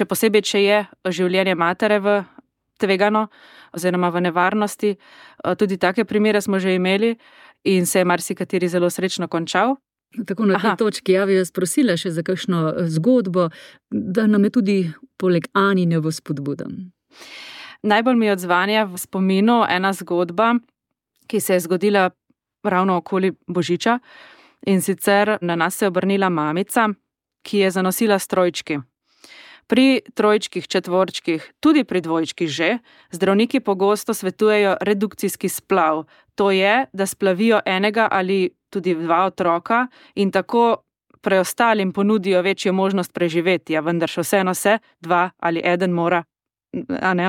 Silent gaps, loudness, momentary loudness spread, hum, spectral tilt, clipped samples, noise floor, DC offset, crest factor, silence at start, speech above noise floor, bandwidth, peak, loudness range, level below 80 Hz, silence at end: none; -19 LUFS; 9 LU; none; -5 dB/octave; under 0.1%; -73 dBFS; under 0.1%; 16 dB; 0 s; 54 dB; 17 kHz; -4 dBFS; 2 LU; -68 dBFS; 0 s